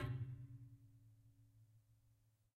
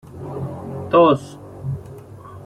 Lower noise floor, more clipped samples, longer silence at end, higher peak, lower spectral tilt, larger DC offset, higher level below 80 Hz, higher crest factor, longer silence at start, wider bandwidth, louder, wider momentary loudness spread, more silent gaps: first, -77 dBFS vs -38 dBFS; neither; first, 0.45 s vs 0 s; second, -32 dBFS vs -2 dBFS; about the same, -8 dB/octave vs -8 dB/octave; neither; second, -70 dBFS vs -52 dBFS; about the same, 20 dB vs 18 dB; about the same, 0 s vs 0.05 s; about the same, 13 kHz vs 12 kHz; second, -52 LUFS vs -20 LUFS; second, 21 LU vs 25 LU; neither